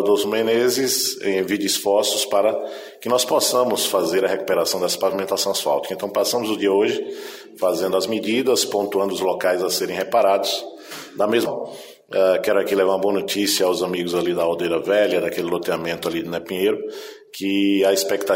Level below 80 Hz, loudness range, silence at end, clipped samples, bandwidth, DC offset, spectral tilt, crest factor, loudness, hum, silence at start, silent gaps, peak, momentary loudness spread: -64 dBFS; 2 LU; 0 s; under 0.1%; 16.5 kHz; under 0.1%; -3 dB/octave; 14 dB; -20 LUFS; none; 0 s; none; -6 dBFS; 9 LU